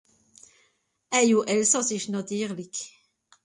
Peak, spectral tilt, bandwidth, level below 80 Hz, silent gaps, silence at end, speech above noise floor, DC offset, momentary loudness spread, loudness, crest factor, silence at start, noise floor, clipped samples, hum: -8 dBFS; -3 dB/octave; 11.5 kHz; -74 dBFS; none; 0.55 s; 44 dB; under 0.1%; 14 LU; -25 LUFS; 20 dB; 1.1 s; -69 dBFS; under 0.1%; none